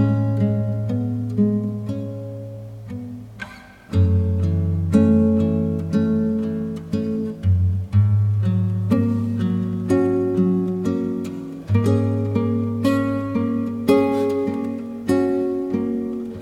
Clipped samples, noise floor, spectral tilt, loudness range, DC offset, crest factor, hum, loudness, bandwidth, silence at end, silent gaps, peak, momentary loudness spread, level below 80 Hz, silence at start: under 0.1%; -40 dBFS; -9 dB/octave; 5 LU; under 0.1%; 16 dB; none; -21 LUFS; 12.5 kHz; 0 s; none; -4 dBFS; 12 LU; -46 dBFS; 0 s